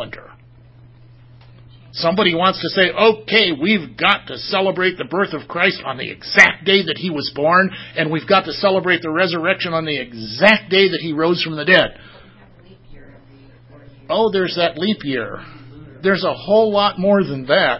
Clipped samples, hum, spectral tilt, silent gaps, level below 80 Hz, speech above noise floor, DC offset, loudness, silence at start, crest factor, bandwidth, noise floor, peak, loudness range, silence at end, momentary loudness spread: under 0.1%; none; -5 dB/octave; none; -52 dBFS; 28 dB; under 0.1%; -16 LUFS; 0 s; 18 dB; 8 kHz; -45 dBFS; 0 dBFS; 5 LU; 0 s; 10 LU